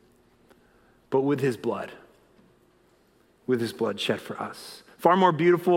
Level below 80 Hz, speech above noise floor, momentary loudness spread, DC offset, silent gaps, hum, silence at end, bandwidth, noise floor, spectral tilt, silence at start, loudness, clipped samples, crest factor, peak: -72 dBFS; 38 dB; 19 LU; under 0.1%; none; none; 0 s; 16 kHz; -62 dBFS; -6.5 dB/octave; 1.1 s; -25 LUFS; under 0.1%; 24 dB; -4 dBFS